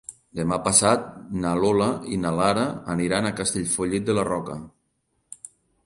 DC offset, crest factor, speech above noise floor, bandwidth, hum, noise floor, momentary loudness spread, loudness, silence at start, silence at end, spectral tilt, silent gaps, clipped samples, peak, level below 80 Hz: under 0.1%; 20 dB; 49 dB; 11.5 kHz; none; -72 dBFS; 17 LU; -23 LUFS; 0.1 s; 0.4 s; -4 dB/octave; none; under 0.1%; -4 dBFS; -52 dBFS